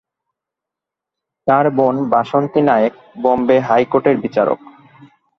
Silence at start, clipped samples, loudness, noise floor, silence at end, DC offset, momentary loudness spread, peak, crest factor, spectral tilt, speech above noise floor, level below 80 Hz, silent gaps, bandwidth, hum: 1.45 s; under 0.1%; -15 LUFS; -84 dBFS; 0.85 s; under 0.1%; 6 LU; 0 dBFS; 16 dB; -8.5 dB/octave; 70 dB; -58 dBFS; none; 6.4 kHz; none